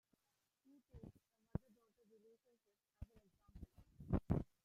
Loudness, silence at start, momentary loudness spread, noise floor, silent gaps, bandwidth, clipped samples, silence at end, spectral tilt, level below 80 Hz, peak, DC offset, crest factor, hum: -46 LUFS; 0.95 s; 21 LU; -88 dBFS; none; 13.5 kHz; under 0.1%; 0.2 s; -10.5 dB/octave; -58 dBFS; -22 dBFS; under 0.1%; 28 dB; none